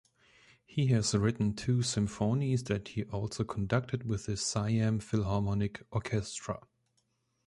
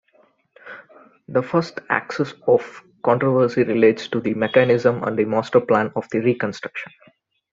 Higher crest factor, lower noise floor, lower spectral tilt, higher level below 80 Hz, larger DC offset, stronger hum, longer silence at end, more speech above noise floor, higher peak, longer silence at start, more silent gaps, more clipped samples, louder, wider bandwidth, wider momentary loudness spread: about the same, 18 dB vs 18 dB; first, -77 dBFS vs -59 dBFS; second, -5.5 dB/octave vs -7 dB/octave; first, -54 dBFS vs -62 dBFS; neither; neither; first, 0.9 s vs 0.65 s; first, 45 dB vs 40 dB; second, -14 dBFS vs -2 dBFS; about the same, 0.7 s vs 0.65 s; neither; neither; second, -32 LUFS vs -20 LUFS; first, 11.5 kHz vs 7.6 kHz; second, 8 LU vs 16 LU